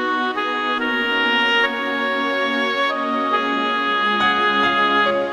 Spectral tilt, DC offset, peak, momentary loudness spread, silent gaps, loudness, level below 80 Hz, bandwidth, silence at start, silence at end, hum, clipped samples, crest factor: -3.5 dB/octave; under 0.1%; -4 dBFS; 5 LU; none; -18 LUFS; -56 dBFS; 14.5 kHz; 0 s; 0 s; none; under 0.1%; 14 dB